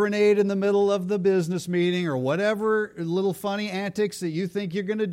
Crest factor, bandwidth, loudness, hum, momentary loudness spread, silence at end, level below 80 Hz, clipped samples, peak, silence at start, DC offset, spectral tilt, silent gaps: 14 dB; 16 kHz; -24 LUFS; none; 8 LU; 0 s; -68 dBFS; under 0.1%; -10 dBFS; 0 s; under 0.1%; -6 dB/octave; none